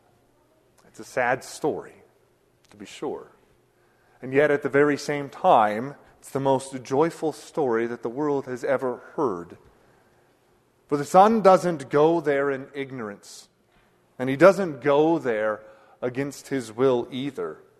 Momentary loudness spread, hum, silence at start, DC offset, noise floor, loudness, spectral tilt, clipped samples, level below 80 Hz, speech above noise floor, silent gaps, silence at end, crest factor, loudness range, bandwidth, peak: 17 LU; none; 1 s; under 0.1%; -63 dBFS; -23 LUFS; -6 dB/octave; under 0.1%; -66 dBFS; 40 dB; none; 0.25 s; 22 dB; 9 LU; 13.5 kHz; -2 dBFS